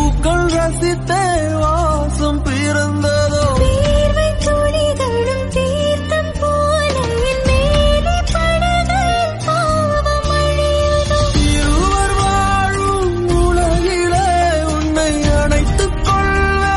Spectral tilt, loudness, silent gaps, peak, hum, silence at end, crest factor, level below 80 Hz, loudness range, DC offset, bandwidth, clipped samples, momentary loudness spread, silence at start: -5 dB/octave; -15 LUFS; none; -2 dBFS; none; 0 s; 12 dB; -20 dBFS; 1 LU; under 0.1%; 11.5 kHz; under 0.1%; 3 LU; 0 s